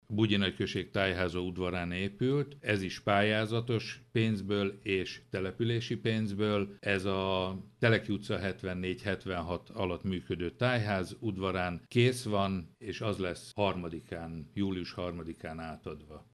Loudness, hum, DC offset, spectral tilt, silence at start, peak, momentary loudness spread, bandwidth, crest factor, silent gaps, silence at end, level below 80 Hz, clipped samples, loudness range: -33 LUFS; none; under 0.1%; -6 dB/octave; 0.1 s; -12 dBFS; 11 LU; 12.5 kHz; 20 dB; none; 0.1 s; -60 dBFS; under 0.1%; 3 LU